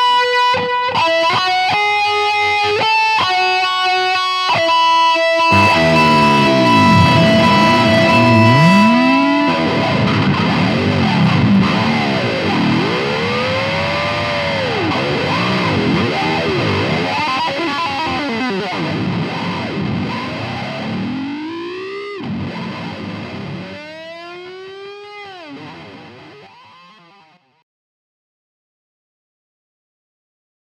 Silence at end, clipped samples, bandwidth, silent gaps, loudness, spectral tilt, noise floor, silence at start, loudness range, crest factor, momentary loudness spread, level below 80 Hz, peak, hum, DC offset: 4.2 s; under 0.1%; 14.5 kHz; none; -14 LUFS; -5.5 dB/octave; -51 dBFS; 0 s; 17 LU; 16 dB; 17 LU; -46 dBFS; 0 dBFS; none; under 0.1%